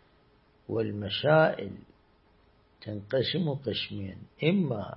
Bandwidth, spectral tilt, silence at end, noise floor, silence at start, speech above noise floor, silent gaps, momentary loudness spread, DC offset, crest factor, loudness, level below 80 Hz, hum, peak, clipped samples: 5.8 kHz; -10.5 dB/octave; 0 s; -63 dBFS; 0.7 s; 35 dB; none; 19 LU; under 0.1%; 22 dB; -29 LUFS; -64 dBFS; none; -8 dBFS; under 0.1%